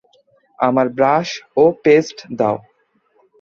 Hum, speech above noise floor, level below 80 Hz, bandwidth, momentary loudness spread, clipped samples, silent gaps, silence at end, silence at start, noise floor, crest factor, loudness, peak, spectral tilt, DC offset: none; 45 dB; -60 dBFS; 7 kHz; 8 LU; under 0.1%; none; 0.8 s; 0.6 s; -61 dBFS; 16 dB; -16 LUFS; 0 dBFS; -6 dB/octave; under 0.1%